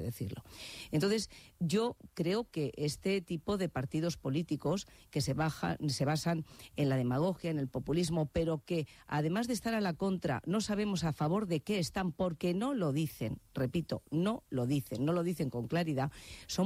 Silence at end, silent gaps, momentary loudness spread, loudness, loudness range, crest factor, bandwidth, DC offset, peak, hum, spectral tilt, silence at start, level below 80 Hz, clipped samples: 0 s; none; 6 LU; -35 LUFS; 1 LU; 14 dB; 16 kHz; under 0.1%; -20 dBFS; none; -6 dB/octave; 0 s; -58 dBFS; under 0.1%